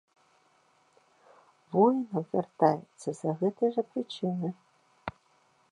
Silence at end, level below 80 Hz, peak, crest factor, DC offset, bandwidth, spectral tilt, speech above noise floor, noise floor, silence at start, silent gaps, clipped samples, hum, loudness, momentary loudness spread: 0.6 s; -70 dBFS; -8 dBFS; 24 dB; under 0.1%; 11 kHz; -7.5 dB/octave; 39 dB; -67 dBFS; 1.7 s; none; under 0.1%; none; -30 LUFS; 18 LU